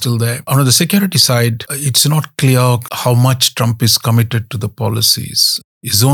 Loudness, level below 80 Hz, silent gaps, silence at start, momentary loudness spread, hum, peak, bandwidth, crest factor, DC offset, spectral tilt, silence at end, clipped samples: -12 LUFS; -54 dBFS; 5.64-5.81 s; 0 s; 8 LU; none; 0 dBFS; 19 kHz; 14 dB; under 0.1%; -4 dB/octave; 0 s; under 0.1%